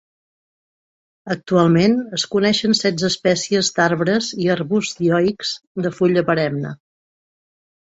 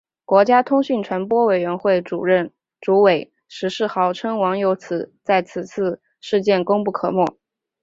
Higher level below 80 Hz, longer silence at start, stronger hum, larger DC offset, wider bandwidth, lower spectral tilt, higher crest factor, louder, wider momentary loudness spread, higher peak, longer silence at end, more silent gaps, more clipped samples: first, -58 dBFS vs -66 dBFS; first, 1.25 s vs 0.3 s; neither; neither; about the same, 8.2 kHz vs 7.8 kHz; second, -5 dB/octave vs -6.5 dB/octave; about the same, 16 dB vs 18 dB; about the same, -18 LUFS vs -19 LUFS; about the same, 9 LU vs 11 LU; about the same, -2 dBFS vs -2 dBFS; first, 1.15 s vs 0.5 s; first, 5.67-5.75 s vs none; neither